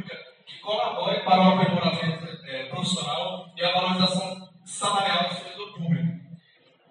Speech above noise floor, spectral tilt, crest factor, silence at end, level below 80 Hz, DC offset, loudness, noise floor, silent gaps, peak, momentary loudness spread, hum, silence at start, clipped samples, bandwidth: 37 dB; -5 dB/octave; 20 dB; 0.55 s; -72 dBFS; under 0.1%; -25 LUFS; -60 dBFS; none; -6 dBFS; 18 LU; none; 0 s; under 0.1%; 10.5 kHz